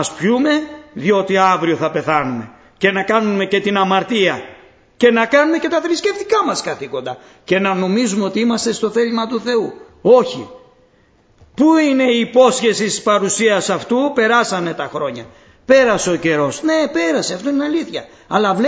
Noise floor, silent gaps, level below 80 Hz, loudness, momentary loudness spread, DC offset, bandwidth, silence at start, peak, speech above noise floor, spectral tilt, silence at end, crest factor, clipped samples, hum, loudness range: -53 dBFS; none; -56 dBFS; -16 LUFS; 11 LU; under 0.1%; 8 kHz; 0 s; 0 dBFS; 38 dB; -4 dB/octave; 0 s; 16 dB; under 0.1%; none; 3 LU